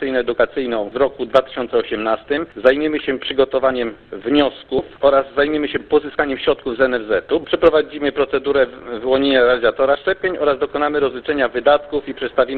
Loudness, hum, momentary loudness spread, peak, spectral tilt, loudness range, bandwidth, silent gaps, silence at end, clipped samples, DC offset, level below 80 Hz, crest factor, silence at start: -18 LUFS; none; 6 LU; 0 dBFS; -7 dB/octave; 2 LU; 5 kHz; none; 0 s; under 0.1%; under 0.1%; -46 dBFS; 18 dB; 0 s